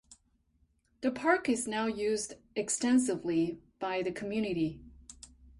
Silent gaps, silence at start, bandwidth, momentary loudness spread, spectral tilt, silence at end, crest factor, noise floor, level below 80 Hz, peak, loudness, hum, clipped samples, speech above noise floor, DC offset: none; 0.1 s; 11.5 kHz; 18 LU; -4 dB/octave; 0.1 s; 18 dB; -72 dBFS; -62 dBFS; -14 dBFS; -32 LUFS; none; under 0.1%; 40 dB; under 0.1%